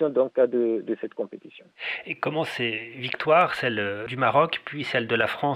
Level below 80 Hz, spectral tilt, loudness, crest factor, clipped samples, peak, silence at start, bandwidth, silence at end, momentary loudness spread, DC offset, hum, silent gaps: -70 dBFS; -6 dB/octave; -25 LUFS; 18 dB; under 0.1%; -8 dBFS; 0 s; 14 kHz; 0 s; 11 LU; under 0.1%; none; none